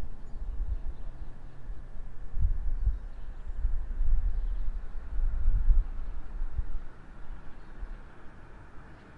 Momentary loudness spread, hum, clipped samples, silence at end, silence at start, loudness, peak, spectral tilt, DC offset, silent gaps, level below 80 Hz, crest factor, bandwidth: 19 LU; none; under 0.1%; 0 s; 0 s; -37 LUFS; -10 dBFS; -8.5 dB/octave; under 0.1%; none; -30 dBFS; 18 dB; 2.4 kHz